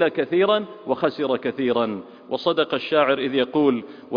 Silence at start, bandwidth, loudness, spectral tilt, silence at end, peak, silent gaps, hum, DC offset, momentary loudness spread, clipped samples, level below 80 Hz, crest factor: 0 s; 5.2 kHz; -22 LUFS; -7.5 dB/octave; 0 s; -4 dBFS; none; none; under 0.1%; 8 LU; under 0.1%; -66 dBFS; 18 dB